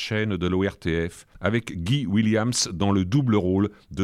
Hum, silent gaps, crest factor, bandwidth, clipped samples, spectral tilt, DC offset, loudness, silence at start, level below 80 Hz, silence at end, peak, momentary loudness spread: none; none; 16 dB; 14.5 kHz; under 0.1%; -5.5 dB/octave; under 0.1%; -24 LUFS; 0 s; -46 dBFS; 0 s; -8 dBFS; 6 LU